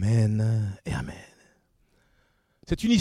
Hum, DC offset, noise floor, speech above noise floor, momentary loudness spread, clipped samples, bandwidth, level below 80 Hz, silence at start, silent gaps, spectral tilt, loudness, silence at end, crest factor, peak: none; under 0.1%; -67 dBFS; 43 dB; 14 LU; under 0.1%; 11.5 kHz; -46 dBFS; 0 s; none; -6.5 dB/octave; -27 LUFS; 0 s; 18 dB; -10 dBFS